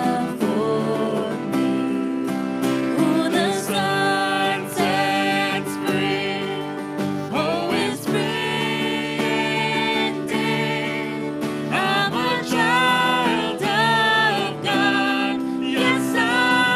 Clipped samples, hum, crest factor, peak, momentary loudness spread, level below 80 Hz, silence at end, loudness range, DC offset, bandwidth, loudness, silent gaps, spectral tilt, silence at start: under 0.1%; none; 16 dB; -6 dBFS; 7 LU; -62 dBFS; 0 s; 4 LU; under 0.1%; 15.5 kHz; -21 LUFS; none; -4.5 dB/octave; 0 s